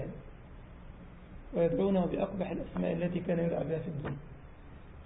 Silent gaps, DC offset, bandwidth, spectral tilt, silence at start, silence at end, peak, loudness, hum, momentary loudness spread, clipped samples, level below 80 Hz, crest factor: none; under 0.1%; 3.9 kHz; -7 dB/octave; 0 s; 0 s; -18 dBFS; -33 LUFS; none; 23 LU; under 0.1%; -52 dBFS; 18 dB